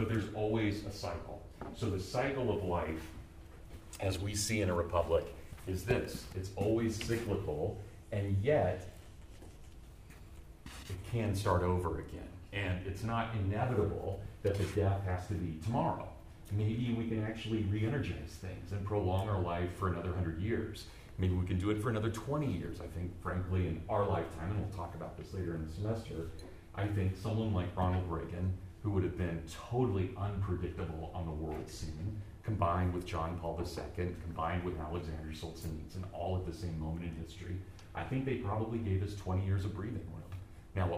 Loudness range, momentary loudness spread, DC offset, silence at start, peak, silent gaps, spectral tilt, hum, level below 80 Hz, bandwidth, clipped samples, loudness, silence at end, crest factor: 3 LU; 14 LU; under 0.1%; 0 s; -18 dBFS; none; -6.5 dB/octave; none; -50 dBFS; 15.5 kHz; under 0.1%; -37 LUFS; 0 s; 18 dB